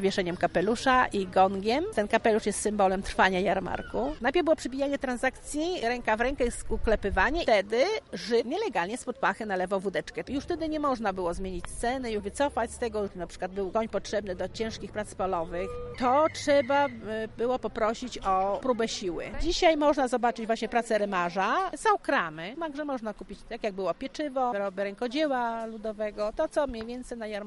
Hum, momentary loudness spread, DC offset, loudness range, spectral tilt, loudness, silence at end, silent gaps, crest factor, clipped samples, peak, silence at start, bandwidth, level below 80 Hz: none; 10 LU; under 0.1%; 5 LU; -4.5 dB/octave; -29 LUFS; 0 s; none; 20 dB; under 0.1%; -8 dBFS; 0 s; 11.5 kHz; -44 dBFS